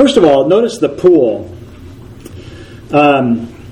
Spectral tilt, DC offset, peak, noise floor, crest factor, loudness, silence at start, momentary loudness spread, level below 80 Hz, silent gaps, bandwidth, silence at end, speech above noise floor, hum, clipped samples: -6 dB/octave; under 0.1%; 0 dBFS; -32 dBFS; 12 dB; -11 LUFS; 0 s; 23 LU; -42 dBFS; none; 11.5 kHz; 0 s; 23 dB; none; 0.2%